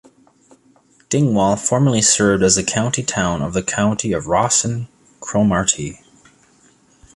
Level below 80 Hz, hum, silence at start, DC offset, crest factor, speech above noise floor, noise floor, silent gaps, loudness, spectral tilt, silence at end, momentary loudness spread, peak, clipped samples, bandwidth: -44 dBFS; none; 1.1 s; under 0.1%; 18 dB; 37 dB; -54 dBFS; none; -17 LUFS; -4 dB/octave; 1.2 s; 10 LU; -2 dBFS; under 0.1%; 11.5 kHz